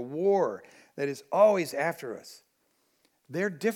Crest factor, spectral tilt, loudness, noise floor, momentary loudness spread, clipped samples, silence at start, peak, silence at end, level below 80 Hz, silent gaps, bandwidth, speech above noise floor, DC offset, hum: 20 dB; -5.5 dB/octave; -28 LUFS; -72 dBFS; 19 LU; under 0.1%; 0 s; -10 dBFS; 0 s; -88 dBFS; none; 17.5 kHz; 44 dB; under 0.1%; none